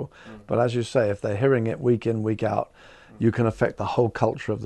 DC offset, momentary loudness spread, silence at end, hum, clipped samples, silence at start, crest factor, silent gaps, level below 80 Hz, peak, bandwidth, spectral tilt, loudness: under 0.1%; 5 LU; 0 s; none; under 0.1%; 0 s; 18 dB; none; -54 dBFS; -6 dBFS; 9.6 kHz; -7.5 dB/octave; -24 LUFS